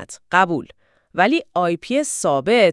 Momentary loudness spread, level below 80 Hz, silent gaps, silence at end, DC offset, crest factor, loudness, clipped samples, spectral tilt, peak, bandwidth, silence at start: 4 LU; -62 dBFS; none; 0 s; under 0.1%; 18 dB; -19 LUFS; under 0.1%; -4 dB/octave; 0 dBFS; 12 kHz; 0 s